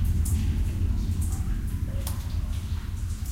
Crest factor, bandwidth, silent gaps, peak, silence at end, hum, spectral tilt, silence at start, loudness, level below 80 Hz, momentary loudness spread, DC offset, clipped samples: 12 dB; 16.5 kHz; none; -16 dBFS; 0 s; none; -6 dB/octave; 0 s; -30 LUFS; -30 dBFS; 6 LU; 0.2%; under 0.1%